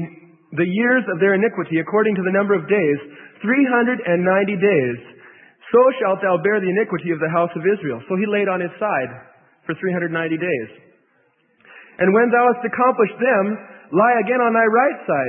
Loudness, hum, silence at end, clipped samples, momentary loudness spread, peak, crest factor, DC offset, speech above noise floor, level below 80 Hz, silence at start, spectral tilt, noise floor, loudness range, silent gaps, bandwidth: -18 LUFS; none; 0 s; under 0.1%; 9 LU; -2 dBFS; 16 dB; under 0.1%; 43 dB; -70 dBFS; 0 s; -12 dB/octave; -61 dBFS; 5 LU; none; 3.7 kHz